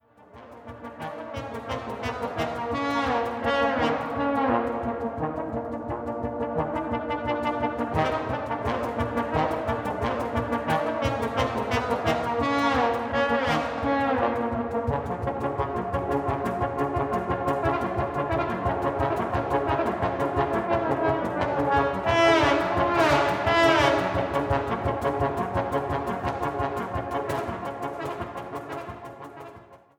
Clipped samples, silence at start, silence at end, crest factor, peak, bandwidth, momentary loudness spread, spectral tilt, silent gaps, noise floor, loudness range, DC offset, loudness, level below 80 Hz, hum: under 0.1%; 0.35 s; 0.2 s; 20 dB; -6 dBFS; 18.5 kHz; 11 LU; -6 dB/octave; none; -49 dBFS; 7 LU; under 0.1%; -26 LUFS; -44 dBFS; none